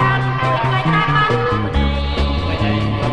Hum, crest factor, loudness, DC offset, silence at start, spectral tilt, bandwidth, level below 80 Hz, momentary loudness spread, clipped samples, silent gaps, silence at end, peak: none; 12 dB; -17 LUFS; under 0.1%; 0 s; -7 dB/octave; 9.4 kHz; -24 dBFS; 4 LU; under 0.1%; none; 0 s; -4 dBFS